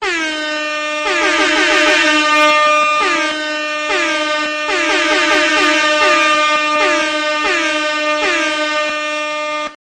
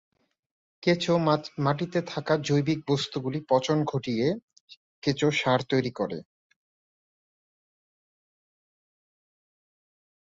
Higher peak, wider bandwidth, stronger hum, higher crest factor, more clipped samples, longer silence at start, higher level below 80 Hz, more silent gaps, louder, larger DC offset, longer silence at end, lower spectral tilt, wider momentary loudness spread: first, -2 dBFS vs -10 dBFS; first, 13 kHz vs 7.8 kHz; neither; second, 12 dB vs 20 dB; neither; second, 0 s vs 0.8 s; first, -52 dBFS vs -64 dBFS; second, none vs 4.42-4.48 s, 4.60-4.68 s, 4.77-5.02 s; first, -13 LUFS vs -27 LUFS; neither; second, 0.05 s vs 4.05 s; second, -0.5 dB/octave vs -6 dB/octave; about the same, 8 LU vs 8 LU